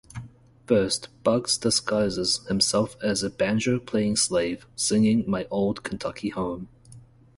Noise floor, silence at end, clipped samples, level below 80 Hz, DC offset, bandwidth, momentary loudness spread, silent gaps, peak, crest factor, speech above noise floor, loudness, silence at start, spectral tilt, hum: -50 dBFS; 0.4 s; under 0.1%; -52 dBFS; under 0.1%; 11.5 kHz; 9 LU; none; -8 dBFS; 18 dB; 25 dB; -24 LUFS; 0.15 s; -4 dB/octave; none